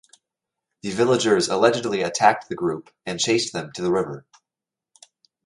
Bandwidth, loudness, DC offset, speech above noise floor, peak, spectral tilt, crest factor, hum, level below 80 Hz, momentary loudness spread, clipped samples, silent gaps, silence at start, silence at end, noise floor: 11.5 kHz; -22 LUFS; under 0.1%; 67 dB; -2 dBFS; -4 dB/octave; 22 dB; none; -62 dBFS; 13 LU; under 0.1%; none; 0.85 s; 1.25 s; -88 dBFS